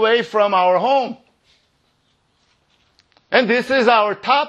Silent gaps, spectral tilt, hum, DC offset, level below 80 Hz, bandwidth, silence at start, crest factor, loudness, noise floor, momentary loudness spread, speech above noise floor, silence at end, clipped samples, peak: none; -4.5 dB/octave; none; under 0.1%; -66 dBFS; 11 kHz; 0 s; 18 dB; -16 LUFS; -63 dBFS; 5 LU; 48 dB; 0 s; under 0.1%; 0 dBFS